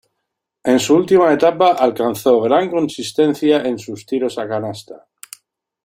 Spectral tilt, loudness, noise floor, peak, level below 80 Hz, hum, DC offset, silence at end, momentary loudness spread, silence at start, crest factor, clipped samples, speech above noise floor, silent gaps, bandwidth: -5 dB/octave; -16 LUFS; -77 dBFS; -2 dBFS; -60 dBFS; none; under 0.1%; 0.9 s; 11 LU; 0.65 s; 16 dB; under 0.1%; 61 dB; none; 16.5 kHz